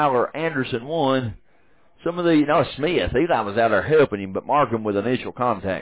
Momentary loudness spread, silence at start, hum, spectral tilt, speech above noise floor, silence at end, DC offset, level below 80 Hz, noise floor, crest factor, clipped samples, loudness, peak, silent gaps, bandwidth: 7 LU; 0 s; none; -10.5 dB/octave; 40 dB; 0 s; 0.2%; -46 dBFS; -60 dBFS; 12 dB; under 0.1%; -21 LUFS; -8 dBFS; none; 4 kHz